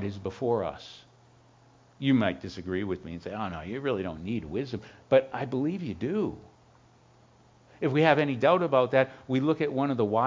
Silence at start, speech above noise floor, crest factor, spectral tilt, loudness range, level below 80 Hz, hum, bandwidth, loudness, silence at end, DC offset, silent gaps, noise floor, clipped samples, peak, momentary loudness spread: 0 s; 31 dB; 22 dB; -7.5 dB/octave; 5 LU; -56 dBFS; none; 7.6 kHz; -28 LUFS; 0 s; under 0.1%; none; -59 dBFS; under 0.1%; -6 dBFS; 13 LU